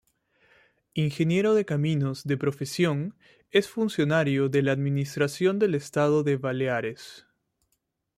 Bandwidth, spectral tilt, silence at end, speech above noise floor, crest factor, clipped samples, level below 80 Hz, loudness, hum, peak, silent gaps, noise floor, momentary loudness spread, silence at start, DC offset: 15 kHz; -6.5 dB/octave; 1 s; 51 dB; 16 dB; under 0.1%; -66 dBFS; -26 LUFS; none; -10 dBFS; none; -77 dBFS; 7 LU; 0.95 s; under 0.1%